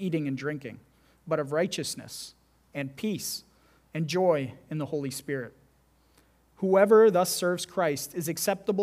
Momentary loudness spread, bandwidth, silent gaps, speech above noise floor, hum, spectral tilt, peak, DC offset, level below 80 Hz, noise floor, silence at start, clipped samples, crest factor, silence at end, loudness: 18 LU; 16 kHz; none; 37 dB; none; -4.5 dB/octave; -6 dBFS; under 0.1%; -68 dBFS; -64 dBFS; 0 s; under 0.1%; 22 dB; 0 s; -27 LUFS